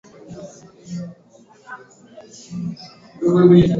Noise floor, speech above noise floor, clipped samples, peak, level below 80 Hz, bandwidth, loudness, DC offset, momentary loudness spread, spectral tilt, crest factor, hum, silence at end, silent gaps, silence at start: -45 dBFS; 27 dB; under 0.1%; -2 dBFS; -46 dBFS; 7.6 kHz; -18 LUFS; under 0.1%; 27 LU; -8.5 dB/octave; 18 dB; none; 0 s; none; 0.3 s